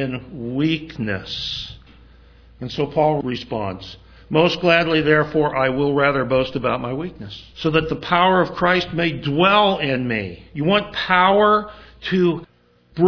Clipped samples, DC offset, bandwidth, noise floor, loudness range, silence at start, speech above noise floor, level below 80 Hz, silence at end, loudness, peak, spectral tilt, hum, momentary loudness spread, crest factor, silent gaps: under 0.1%; under 0.1%; 5.4 kHz; -47 dBFS; 6 LU; 0 s; 28 dB; -46 dBFS; 0 s; -19 LUFS; 0 dBFS; -6.5 dB/octave; none; 14 LU; 20 dB; none